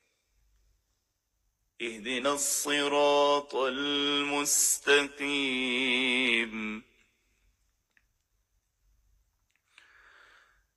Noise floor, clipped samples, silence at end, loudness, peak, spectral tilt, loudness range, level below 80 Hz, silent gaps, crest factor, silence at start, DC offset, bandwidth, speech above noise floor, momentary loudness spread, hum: -79 dBFS; under 0.1%; 3.95 s; -27 LUFS; -12 dBFS; -0.5 dB/octave; 7 LU; -68 dBFS; none; 20 dB; 1.8 s; under 0.1%; 12.5 kHz; 51 dB; 12 LU; none